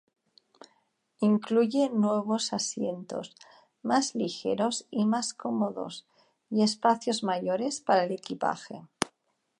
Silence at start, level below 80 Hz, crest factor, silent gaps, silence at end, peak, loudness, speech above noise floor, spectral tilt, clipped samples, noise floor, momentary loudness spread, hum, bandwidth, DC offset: 1.2 s; -76 dBFS; 22 dB; none; 0.5 s; -6 dBFS; -29 LUFS; 47 dB; -4.5 dB/octave; under 0.1%; -75 dBFS; 13 LU; none; 11.5 kHz; under 0.1%